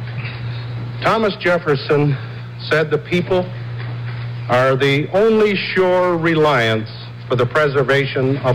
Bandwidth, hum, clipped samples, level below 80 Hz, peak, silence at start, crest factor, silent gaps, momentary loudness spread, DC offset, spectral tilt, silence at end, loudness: 13.5 kHz; none; under 0.1%; -48 dBFS; -8 dBFS; 0 s; 8 dB; none; 12 LU; under 0.1%; -7 dB/octave; 0 s; -17 LUFS